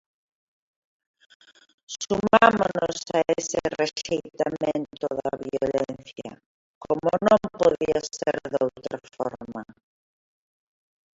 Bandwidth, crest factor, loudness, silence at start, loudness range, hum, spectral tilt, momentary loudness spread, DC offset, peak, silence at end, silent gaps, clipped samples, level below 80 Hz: 8 kHz; 26 dB; -24 LUFS; 1.9 s; 5 LU; none; -4.5 dB/octave; 17 LU; under 0.1%; 0 dBFS; 1.55 s; 6.46-6.81 s; under 0.1%; -58 dBFS